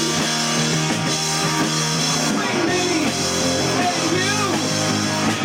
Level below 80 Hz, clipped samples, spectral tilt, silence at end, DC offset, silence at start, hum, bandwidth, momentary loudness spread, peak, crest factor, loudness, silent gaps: -52 dBFS; under 0.1%; -3 dB/octave; 0 s; under 0.1%; 0 s; none; 16.5 kHz; 1 LU; -10 dBFS; 10 dB; -19 LUFS; none